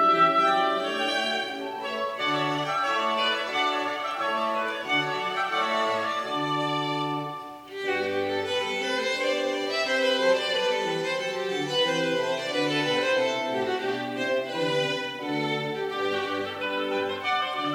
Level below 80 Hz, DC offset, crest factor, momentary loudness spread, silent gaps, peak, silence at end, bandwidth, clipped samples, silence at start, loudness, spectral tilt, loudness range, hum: -74 dBFS; under 0.1%; 16 dB; 6 LU; none; -10 dBFS; 0 s; 16 kHz; under 0.1%; 0 s; -26 LUFS; -3.5 dB/octave; 3 LU; none